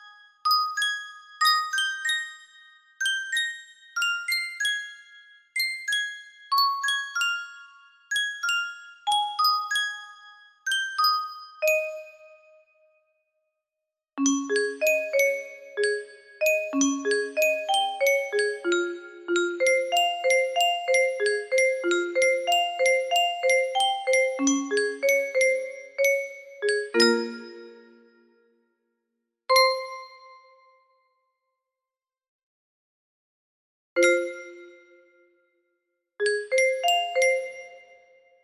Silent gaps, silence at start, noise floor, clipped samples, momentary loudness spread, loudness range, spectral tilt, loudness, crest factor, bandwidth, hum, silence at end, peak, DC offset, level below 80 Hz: 32.28-33.96 s; 0 s; under -90 dBFS; under 0.1%; 13 LU; 7 LU; 0 dB/octave; -24 LUFS; 22 dB; 15.5 kHz; none; 0.65 s; -6 dBFS; under 0.1%; -78 dBFS